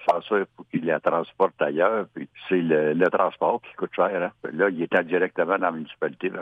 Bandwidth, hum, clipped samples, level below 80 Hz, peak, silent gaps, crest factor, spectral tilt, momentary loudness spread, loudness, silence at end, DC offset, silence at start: 7.4 kHz; none; under 0.1%; -72 dBFS; -6 dBFS; none; 18 dB; -8 dB/octave; 9 LU; -24 LUFS; 0 s; under 0.1%; 0 s